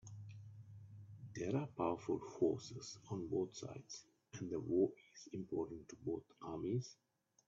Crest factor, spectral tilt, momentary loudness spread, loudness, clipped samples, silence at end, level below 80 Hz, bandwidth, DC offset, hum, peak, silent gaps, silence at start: 20 dB; -7 dB/octave; 18 LU; -43 LUFS; under 0.1%; 0.55 s; -76 dBFS; 7.8 kHz; under 0.1%; none; -24 dBFS; none; 0.05 s